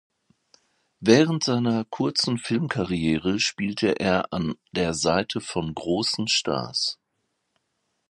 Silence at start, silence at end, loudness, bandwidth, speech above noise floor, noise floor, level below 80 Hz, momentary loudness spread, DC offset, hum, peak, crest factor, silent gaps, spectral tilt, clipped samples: 1 s; 1.15 s; -24 LUFS; 11.5 kHz; 52 dB; -76 dBFS; -52 dBFS; 9 LU; under 0.1%; none; -4 dBFS; 22 dB; none; -4.5 dB/octave; under 0.1%